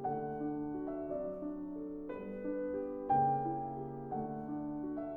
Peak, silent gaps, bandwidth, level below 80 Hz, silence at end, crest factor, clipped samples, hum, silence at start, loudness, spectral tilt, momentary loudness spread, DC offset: -22 dBFS; none; 3.4 kHz; -62 dBFS; 0 s; 16 dB; under 0.1%; none; 0 s; -39 LUFS; -11.5 dB/octave; 11 LU; under 0.1%